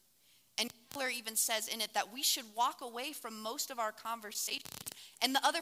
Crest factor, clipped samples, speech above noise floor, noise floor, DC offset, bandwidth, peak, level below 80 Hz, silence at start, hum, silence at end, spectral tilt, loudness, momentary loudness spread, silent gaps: 26 dB; under 0.1%; 32 dB; -69 dBFS; under 0.1%; 16.5 kHz; -12 dBFS; -84 dBFS; 0.6 s; none; 0 s; 0.5 dB/octave; -36 LUFS; 10 LU; none